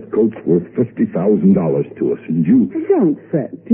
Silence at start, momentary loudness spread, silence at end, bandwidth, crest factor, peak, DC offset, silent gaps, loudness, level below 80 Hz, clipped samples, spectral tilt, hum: 0 s; 7 LU; 0 s; 3.3 kHz; 14 dB; -2 dBFS; under 0.1%; none; -16 LUFS; -54 dBFS; under 0.1%; -15 dB/octave; none